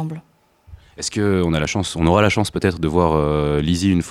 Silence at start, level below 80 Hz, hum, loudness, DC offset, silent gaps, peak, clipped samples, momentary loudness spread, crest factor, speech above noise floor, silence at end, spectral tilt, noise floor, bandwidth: 0 s; -34 dBFS; none; -18 LUFS; under 0.1%; none; -2 dBFS; under 0.1%; 9 LU; 18 dB; 27 dB; 0 s; -5.5 dB/octave; -45 dBFS; 14 kHz